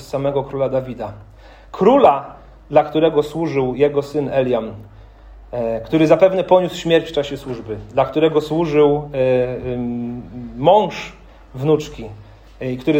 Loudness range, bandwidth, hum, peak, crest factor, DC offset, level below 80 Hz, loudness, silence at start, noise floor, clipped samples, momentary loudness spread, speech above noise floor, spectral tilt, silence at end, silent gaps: 3 LU; 16 kHz; none; 0 dBFS; 18 dB; under 0.1%; -44 dBFS; -17 LUFS; 0 s; -40 dBFS; under 0.1%; 17 LU; 23 dB; -7 dB/octave; 0 s; none